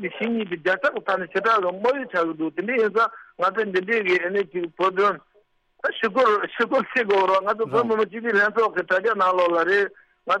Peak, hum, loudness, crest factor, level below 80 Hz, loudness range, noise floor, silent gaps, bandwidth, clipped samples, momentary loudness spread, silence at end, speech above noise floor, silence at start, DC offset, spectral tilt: -6 dBFS; none; -22 LUFS; 16 dB; -70 dBFS; 2 LU; -61 dBFS; none; 9.4 kHz; under 0.1%; 6 LU; 0 s; 39 dB; 0 s; under 0.1%; -5.5 dB/octave